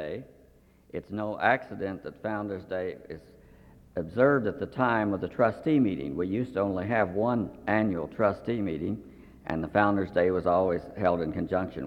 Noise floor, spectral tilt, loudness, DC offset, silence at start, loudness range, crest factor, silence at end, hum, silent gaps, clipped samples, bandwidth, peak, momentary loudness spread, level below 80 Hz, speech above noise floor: -59 dBFS; -9 dB/octave; -28 LUFS; under 0.1%; 0 s; 5 LU; 20 dB; 0 s; none; none; under 0.1%; 8 kHz; -8 dBFS; 12 LU; -56 dBFS; 31 dB